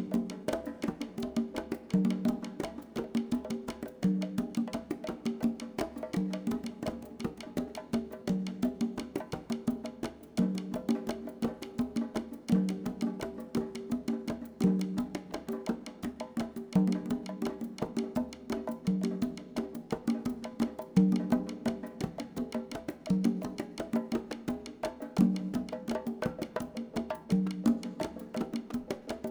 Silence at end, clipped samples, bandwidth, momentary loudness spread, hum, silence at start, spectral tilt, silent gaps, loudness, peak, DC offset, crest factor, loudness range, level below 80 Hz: 0 s; under 0.1%; over 20 kHz; 9 LU; none; 0 s; -7 dB/octave; none; -35 LUFS; -14 dBFS; under 0.1%; 20 dB; 3 LU; -60 dBFS